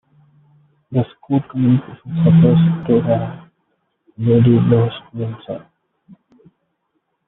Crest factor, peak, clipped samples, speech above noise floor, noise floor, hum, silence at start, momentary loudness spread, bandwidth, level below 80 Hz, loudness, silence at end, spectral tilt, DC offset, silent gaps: 16 dB; -2 dBFS; under 0.1%; 55 dB; -70 dBFS; none; 0.9 s; 15 LU; 3.9 kHz; -50 dBFS; -16 LUFS; 1.7 s; -9.5 dB/octave; under 0.1%; none